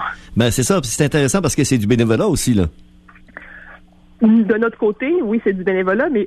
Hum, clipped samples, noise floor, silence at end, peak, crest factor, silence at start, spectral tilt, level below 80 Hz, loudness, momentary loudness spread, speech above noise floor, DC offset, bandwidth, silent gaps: none; under 0.1%; -45 dBFS; 0 s; -2 dBFS; 14 dB; 0 s; -5.5 dB/octave; -38 dBFS; -16 LUFS; 6 LU; 29 dB; under 0.1%; 13 kHz; none